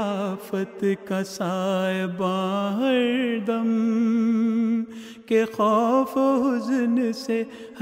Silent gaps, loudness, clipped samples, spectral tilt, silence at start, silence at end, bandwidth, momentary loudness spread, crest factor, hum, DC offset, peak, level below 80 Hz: none; -23 LUFS; under 0.1%; -6.5 dB/octave; 0 s; 0 s; 16 kHz; 7 LU; 14 dB; none; under 0.1%; -10 dBFS; -70 dBFS